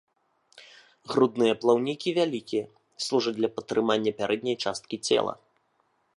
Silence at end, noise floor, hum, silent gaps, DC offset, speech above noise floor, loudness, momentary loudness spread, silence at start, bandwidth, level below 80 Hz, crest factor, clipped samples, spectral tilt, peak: 0.85 s; -71 dBFS; none; none; under 0.1%; 45 dB; -27 LUFS; 9 LU; 0.6 s; 11.5 kHz; -72 dBFS; 20 dB; under 0.1%; -4.5 dB/octave; -8 dBFS